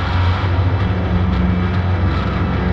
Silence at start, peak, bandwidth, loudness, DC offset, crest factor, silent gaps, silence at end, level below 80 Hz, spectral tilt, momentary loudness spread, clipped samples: 0 s; -4 dBFS; 6 kHz; -17 LUFS; under 0.1%; 12 dB; none; 0 s; -24 dBFS; -8.5 dB/octave; 2 LU; under 0.1%